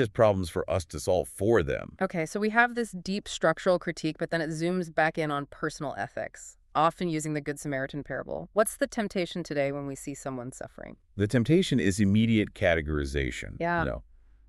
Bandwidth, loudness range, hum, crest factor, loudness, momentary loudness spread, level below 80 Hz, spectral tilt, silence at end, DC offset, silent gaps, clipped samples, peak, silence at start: 13.5 kHz; 5 LU; none; 22 dB; -28 LUFS; 12 LU; -48 dBFS; -5.5 dB/octave; 0.45 s; under 0.1%; none; under 0.1%; -6 dBFS; 0 s